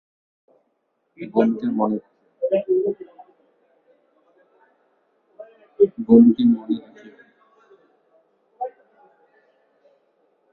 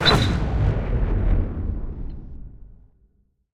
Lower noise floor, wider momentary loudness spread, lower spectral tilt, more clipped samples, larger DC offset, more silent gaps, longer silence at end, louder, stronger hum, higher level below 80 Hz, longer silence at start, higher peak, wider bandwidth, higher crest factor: first, -71 dBFS vs -62 dBFS; about the same, 20 LU vs 21 LU; first, -10 dB/octave vs -5.5 dB/octave; neither; neither; neither; first, 1.85 s vs 0.85 s; first, -20 LUFS vs -24 LUFS; neither; second, -68 dBFS vs -26 dBFS; first, 1.2 s vs 0 s; about the same, -2 dBFS vs -2 dBFS; second, 4.2 kHz vs 12 kHz; about the same, 22 dB vs 20 dB